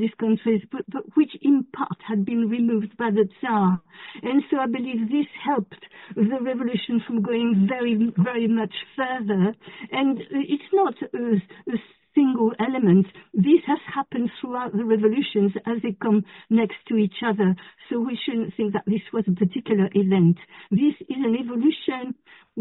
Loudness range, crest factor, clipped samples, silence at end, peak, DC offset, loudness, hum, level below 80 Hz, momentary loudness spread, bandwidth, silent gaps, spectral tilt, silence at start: 3 LU; 16 dB; under 0.1%; 0 s; -8 dBFS; under 0.1%; -23 LUFS; none; -66 dBFS; 9 LU; 4.1 kHz; none; -6.5 dB/octave; 0 s